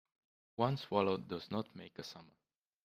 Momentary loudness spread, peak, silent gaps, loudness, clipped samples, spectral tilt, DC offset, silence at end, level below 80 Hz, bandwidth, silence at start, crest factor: 16 LU; -16 dBFS; none; -38 LUFS; under 0.1%; -7 dB/octave; under 0.1%; 0.6 s; -76 dBFS; 15 kHz; 0.6 s; 24 dB